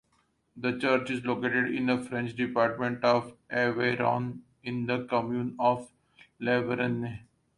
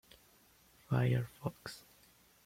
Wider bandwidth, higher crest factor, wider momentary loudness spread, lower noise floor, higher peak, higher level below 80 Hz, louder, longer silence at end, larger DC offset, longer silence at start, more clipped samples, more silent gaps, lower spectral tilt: second, 11 kHz vs 16 kHz; about the same, 20 dB vs 18 dB; second, 8 LU vs 17 LU; first, -71 dBFS vs -66 dBFS; first, -10 dBFS vs -22 dBFS; about the same, -66 dBFS vs -66 dBFS; first, -29 LUFS vs -37 LUFS; second, 0.4 s vs 0.65 s; neither; second, 0.55 s vs 0.9 s; neither; neither; about the same, -7 dB/octave vs -7 dB/octave